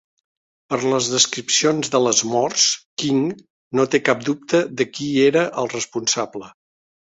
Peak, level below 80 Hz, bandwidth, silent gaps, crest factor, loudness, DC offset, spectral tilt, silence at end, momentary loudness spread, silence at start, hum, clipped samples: -2 dBFS; -62 dBFS; 8.4 kHz; 2.85-2.97 s, 3.50-3.71 s; 18 dB; -19 LUFS; under 0.1%; -2.5 dB/octave; 0.5 s; 8 LU; 0.7 s; none; under 0.1%